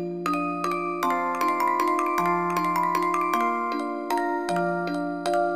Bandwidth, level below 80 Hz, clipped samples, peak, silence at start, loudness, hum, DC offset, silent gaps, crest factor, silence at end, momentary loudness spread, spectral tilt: 15.5 kHz; -72 dBFS; under 0.1%; -8 dBFS; 0 s; -25 LUFS; none; 0.2%; none; 16 dB; 0 s; 4 LU; -5.5 dB/octave